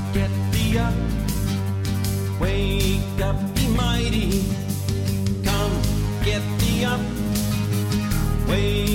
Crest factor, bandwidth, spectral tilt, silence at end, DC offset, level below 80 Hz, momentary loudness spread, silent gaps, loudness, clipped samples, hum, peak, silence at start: 14 dB; 17 kHz; -5.5 dB/octave; 0 s; under 0.1%; -28 dBFS; 3 LU; none; -23 LUFS; under 0.1%; none; -8 dBFS; 0 s